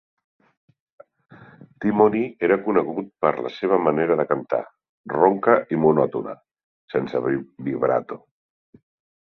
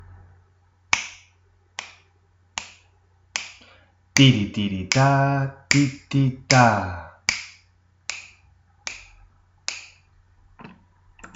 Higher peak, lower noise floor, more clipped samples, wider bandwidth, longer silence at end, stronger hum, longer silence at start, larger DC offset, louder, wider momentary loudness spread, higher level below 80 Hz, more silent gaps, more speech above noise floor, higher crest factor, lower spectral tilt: about the same, -2 dBFS vs 0 dBFS; second, -47 dBFS vs -60 dBFS; neither; second, 5.8 kHz vs 8 kHz; first, 1.1 s vs 0.1 s; neither; first, 1.4 s vs 0.95 s; neither; about the same, -22 LUFS vs -22 LUFS; second, 11 LU vs 21 LU; second, -64 dBFS vs -54 dBFS; first, 4.89-5.04 s, 6.64-6.88 s vs none; second, 26 dB vs 41 dB; about the same, 20 dB vs 24 dB; first, -9.5 dB/octave vs -4.5 dB/octave